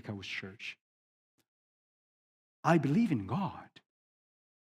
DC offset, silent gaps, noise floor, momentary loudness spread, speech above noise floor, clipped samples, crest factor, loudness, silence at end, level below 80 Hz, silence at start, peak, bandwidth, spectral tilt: under 0.1%; 0.81-1.38 s, 1.48-2.63 s; under -90 dBFS; 17 LU; over 58 dB; under 0.1%; 24 dB; -33 LUFS; 0.95 s; -76 dBFS; 0.05 s; -12 dBFS; 12 kHz; -7 dB/octave